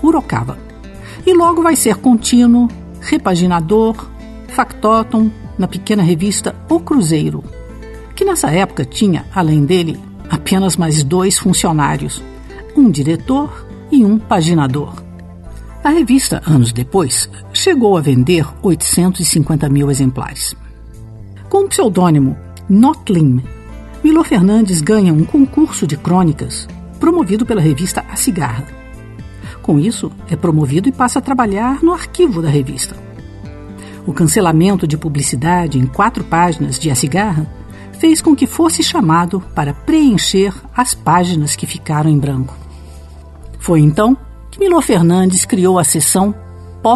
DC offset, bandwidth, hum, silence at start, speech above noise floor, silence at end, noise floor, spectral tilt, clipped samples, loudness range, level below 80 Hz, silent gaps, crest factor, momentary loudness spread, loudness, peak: under 0.1%; 12.5 kHz; none; 0 s; 21 dB; 0 s; -33 dBFS; -5.5 dB/octave; under 0.1%; 3 LU; -34 dBFS; none; 14 dB; 19 LU; -13 LUFS; 0 dBFS